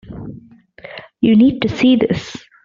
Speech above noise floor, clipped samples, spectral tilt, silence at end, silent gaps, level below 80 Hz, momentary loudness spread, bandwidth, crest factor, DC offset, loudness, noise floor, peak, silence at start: 28 dB; under 0.1%; -6.5 dB/octave; 0.25 s; none; -48 dBFS; 22 LU; 7.4 kHz; 14 dB; under 0.1%; -14 LUFS; -41 dBFS; -2 dBFS; 0.1 s